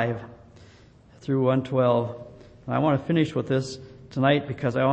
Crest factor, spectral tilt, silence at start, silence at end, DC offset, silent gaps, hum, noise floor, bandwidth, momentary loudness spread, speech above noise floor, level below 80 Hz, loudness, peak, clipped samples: 18 dB; -7.5 dB/octave; 0 s; 0 s; under 0.1%; none; none; -52 dBFS; 8.6 kHz; 18 LU; 29 dB; -58 dBFS; -25 LUFS; -8 dBFS; under 0.1%